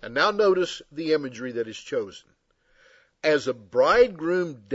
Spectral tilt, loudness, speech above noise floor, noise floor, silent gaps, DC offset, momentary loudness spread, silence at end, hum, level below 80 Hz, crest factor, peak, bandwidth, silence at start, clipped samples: -4.5 dB/octave; -24 LUFS; 41 dB; -65 dBFS; none; under 0.1%; 12 LU; 0 s; none; -56 dBFS; 18 dB; -6 dBFS; 8 kHz; 0 s; under 0.1%